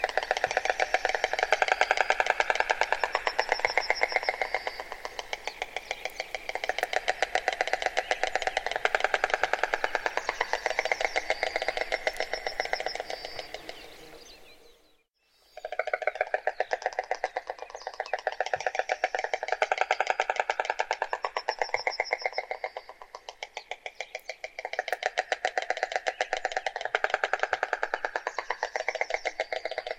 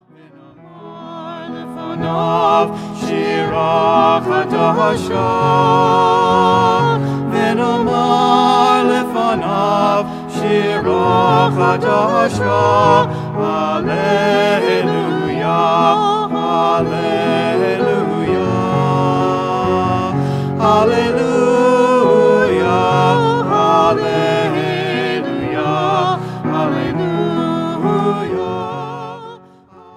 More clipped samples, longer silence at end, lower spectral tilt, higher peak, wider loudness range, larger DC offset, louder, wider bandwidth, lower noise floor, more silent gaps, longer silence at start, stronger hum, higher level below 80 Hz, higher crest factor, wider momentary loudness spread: neither; second, 0 s vs 0.6 s; second, -0.5 dB/octave vs -6.5 dB/octave; about the same, -2 dBFS vs 0 dBFS; first, 8 LU vs 5 LU; neither; second, -30 LUFS vs -14 LUFS; about the same, 16 kHz vs 15 kHz; first, -68 dBFS vs -43 dBFS; neither; second, 0 s vs 0.65 s; neither; second, -58 dBFS vs -48 dBFS; first, 28 dB vs 14 dB; first, 12 LU vs 8 LU